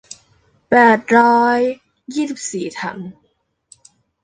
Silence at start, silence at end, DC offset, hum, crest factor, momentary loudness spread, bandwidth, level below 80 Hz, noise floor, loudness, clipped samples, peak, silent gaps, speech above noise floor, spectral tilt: 0.7 s; 1.1 s; under 0.1%; none; 16 dB; 18 LU; 9.8 kHz; -62 dBFS; -65 dBFS; -16 LUFS; under 0.1%; -2 dBFS; none; 50 dB; -4.5 dB/octave